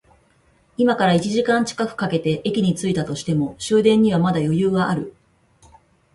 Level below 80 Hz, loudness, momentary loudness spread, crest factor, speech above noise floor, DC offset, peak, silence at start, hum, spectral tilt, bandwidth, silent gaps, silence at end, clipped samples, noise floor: -54 dBFS; -20 LUFS; 8 LU; 16 dB; 40 dB; under 0.1%; -4 dBFS; 0.8 s; none; -6 dB/octave; 11.5 kHz; none; 1.05 s; under 0.1%; -58 dBFS